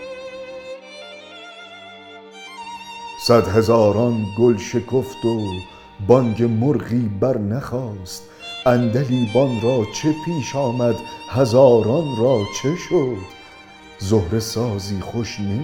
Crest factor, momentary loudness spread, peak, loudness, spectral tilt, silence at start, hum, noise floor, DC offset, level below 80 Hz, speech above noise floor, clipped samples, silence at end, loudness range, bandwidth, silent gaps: 20 dB; 21 LU; 0 dBFS; -19 LUFS; -6.5 dB/octave; 0 s; none; -42 dBFS; under 0.1%; -50 dBFS; 24 dB; under 0.1%; 0 s; 4 LU; 17.5 kHz; none